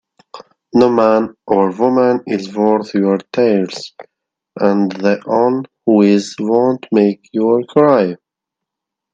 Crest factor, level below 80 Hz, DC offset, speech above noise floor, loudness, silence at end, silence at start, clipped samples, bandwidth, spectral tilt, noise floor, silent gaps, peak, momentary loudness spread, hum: 14 dB; -62 dBFS; under 0.1%; 68 dB; -14 LUFS; 1 s; 0.35 s; under 0.1%; 8 kHz; -7 dB/octave; -82 dBFS; none; 0 dBFS; 7 LU; none